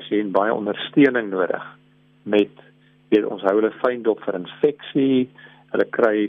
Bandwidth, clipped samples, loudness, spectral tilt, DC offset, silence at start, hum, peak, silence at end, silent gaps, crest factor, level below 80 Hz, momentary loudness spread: 5.2 kHz; under 0.1%; -21 LUFS; -8 dB/octave; under 0.1%; 0 s; none; -4 dBFS; 0 s; none; 18 dB; -70 dBFS; 10 LU